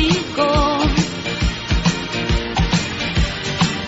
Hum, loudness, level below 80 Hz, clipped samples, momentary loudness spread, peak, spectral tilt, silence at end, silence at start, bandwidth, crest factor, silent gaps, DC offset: none; -19 LUFS; -26 dBFS; under 0.1%; 5 LU; -4 dBFS; -5 dB/octave; 0 s; 0 s; 8 kHz; 14 dB; none; under 0.1%